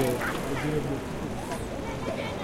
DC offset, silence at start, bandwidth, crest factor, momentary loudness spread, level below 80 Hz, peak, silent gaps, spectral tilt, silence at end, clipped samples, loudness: under 0.1%; 0 s; 16.5 kHz; 18 dB; 5 LU; -44 dBFS; -12 dBFS; none; -5.5 dB/octave; 0 s; under 0.1%; -31 LUFS